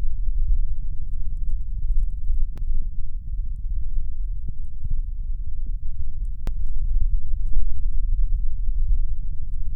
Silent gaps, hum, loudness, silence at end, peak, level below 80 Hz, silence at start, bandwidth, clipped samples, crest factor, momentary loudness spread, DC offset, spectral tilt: none; none; -31 LUFS; 0 s; -6 dBFS; -22 dBFS; 0 s; 0.4 kHz; under 0.1%; 12 dB; 6 LU; under 0.1%; -9 dB/octave